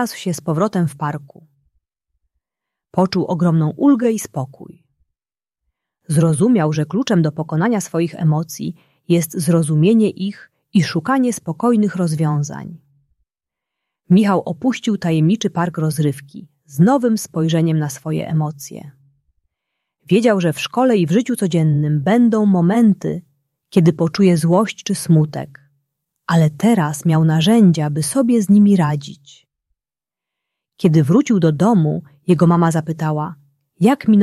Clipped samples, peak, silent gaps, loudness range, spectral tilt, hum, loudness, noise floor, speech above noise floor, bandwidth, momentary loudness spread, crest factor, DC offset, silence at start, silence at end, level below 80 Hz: under 0.1%; -2 dBFS; none; 4 LU; -7 dB/octave; none; -16 LUFS; -90 dBFS; 74 dB; 14 kHz; 12 LU; 14 dB; under 0.1%; 0 s; 0 s; -58 dBFS